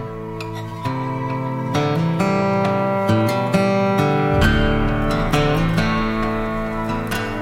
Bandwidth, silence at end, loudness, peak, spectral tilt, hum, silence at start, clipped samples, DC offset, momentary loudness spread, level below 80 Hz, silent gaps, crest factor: 16.5 kHz; 0 s; -20 LUFS; -2 dBFS; -6.5 dB/octave; none; 0 s; under 0.1%; 0.2%; 8 LU; -30 dBFS; none; 16 dB